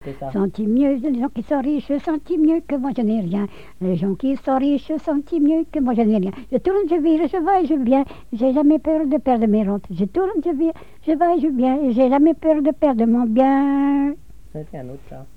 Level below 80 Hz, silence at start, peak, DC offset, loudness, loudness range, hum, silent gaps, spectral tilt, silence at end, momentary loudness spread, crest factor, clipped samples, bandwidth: -46 dBFS; 0.05 s; -6 dBFS; 1%; -19 LUFS; 4 LU; none; none; -9 dB/octave; 0.1 s; 8 LU; 12 dB; under 0.1%; 5.2 kHz